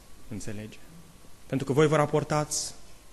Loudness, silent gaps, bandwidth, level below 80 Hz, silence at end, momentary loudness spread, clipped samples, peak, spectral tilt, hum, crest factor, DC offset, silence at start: -27 LUFS; none; 12.5 kHz; -54 dBFS; 0 s; 19 LU; under 0.1%; -8 dBFS; -5 dB/octave; none; 20 dB; under 0.1%; 0.1 s